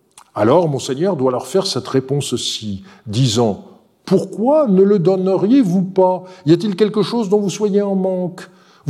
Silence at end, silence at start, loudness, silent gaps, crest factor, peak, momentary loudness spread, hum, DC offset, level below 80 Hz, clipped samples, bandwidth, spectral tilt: 0 s; 0.35 s; -16 LUFS; none; 16 dB; 0 dBFS; 10 LU; none; under 0.1%; -62 dBFS; under 0.1%; 13.5 kHz; -6 dB/octave